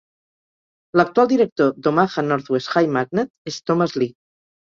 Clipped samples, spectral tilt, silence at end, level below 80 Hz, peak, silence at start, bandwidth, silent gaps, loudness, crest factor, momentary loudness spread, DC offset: under 0.1%; -6.5 dB/octave; 0.55 s; -62 dBFS; 0 dBFS; 0.95 s; 7.4 kHz; 1.52-1.56 s, 3.30-3.45 s; -20 LUFS; 20 dB; 8 LU; under 0.1%